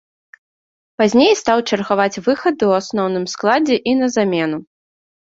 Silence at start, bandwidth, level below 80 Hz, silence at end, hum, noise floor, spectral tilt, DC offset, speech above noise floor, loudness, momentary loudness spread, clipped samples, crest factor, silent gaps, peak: 1 s; 7.8 kHz; -58 dBFS; 0.65 s; none; under -90 dBFS; -4.5 dB/octave; under 0.1%; over 74 dB; -16 LUFS; 7 LU; under 0.1%; 16 dB; none; -2 dBFS